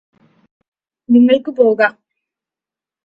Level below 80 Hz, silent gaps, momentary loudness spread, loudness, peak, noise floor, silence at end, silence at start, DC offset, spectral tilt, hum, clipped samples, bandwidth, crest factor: -64 dBFS; none; 5 LU; -13 LUFS; 0 dBFS; -88 dBFS; 1.15 s; 1.1 s; under 0.1%; -7.5 dB/octave; none; under 0.1%; 5.4 kHz; 16 dB